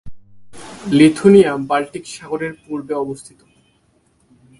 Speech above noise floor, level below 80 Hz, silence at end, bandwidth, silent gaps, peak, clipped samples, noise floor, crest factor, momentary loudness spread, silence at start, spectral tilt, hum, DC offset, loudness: 44 dB; -52 dBFS; 1.35 s; 11.5 kHz; none; 0 dBFS; under 0.1%; -59 dBFS; 18 dB; 20 LU; 0.05 s; -6 dB/octave; none; under 0.1%; -16 LUFS